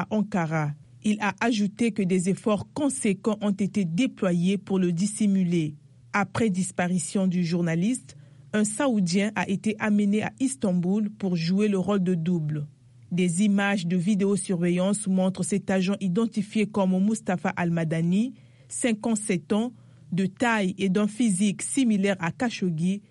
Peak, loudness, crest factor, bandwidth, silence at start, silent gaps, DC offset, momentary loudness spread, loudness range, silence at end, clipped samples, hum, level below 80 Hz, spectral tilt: -10 dBFS; -25 LUFS; 14 dB; 11.5 kHz; 0 s; none; under 0.1%; 4 LU; 1 LU; 0.1 s; under 0.1%; none; -66 dBFS; -5.5 dB/octave